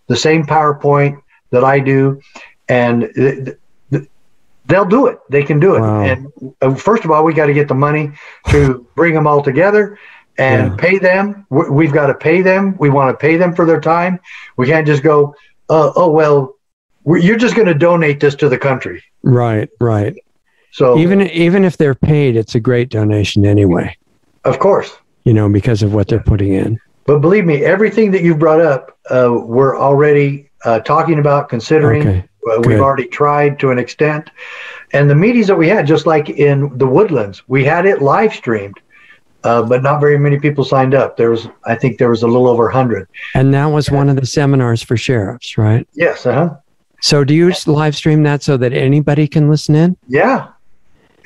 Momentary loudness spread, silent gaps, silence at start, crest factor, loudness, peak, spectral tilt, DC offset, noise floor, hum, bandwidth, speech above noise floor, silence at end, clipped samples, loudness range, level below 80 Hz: 8 LU; 16.73-16.89 s; 0.1 s; 12 dB; -12 LUFS; 0 dBFS; -7 dB/octave; 0.1%; -58 dBFS; none; 11.5 kHz; 47 dB; 0.8 s; under 0.1%; 2 LU; -40 dBFS